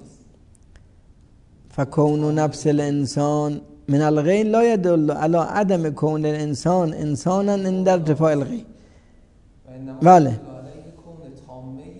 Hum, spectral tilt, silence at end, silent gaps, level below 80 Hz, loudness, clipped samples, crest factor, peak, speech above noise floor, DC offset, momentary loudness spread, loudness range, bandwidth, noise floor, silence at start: none; -7.5 dB/octave; 0 s; none; -52 dBFS; -19 LUFS; under 0.1%; 20 dB; -2 dBFS; 32 dB; under 0.1%; 18 LU; 3 LU; 10.5 kHz; -51 dBFS; 1.75 s